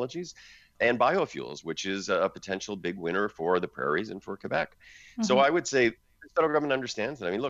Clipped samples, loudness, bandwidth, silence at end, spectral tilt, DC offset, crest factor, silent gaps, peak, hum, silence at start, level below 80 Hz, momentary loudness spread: under 0.1%; -28 LUFS; 8 kHz; 0 s; -4 dB/octave; under 0.1%; 18 dB; none; -12 dBFS; none; 0 s; -66 dBFS; 13 LU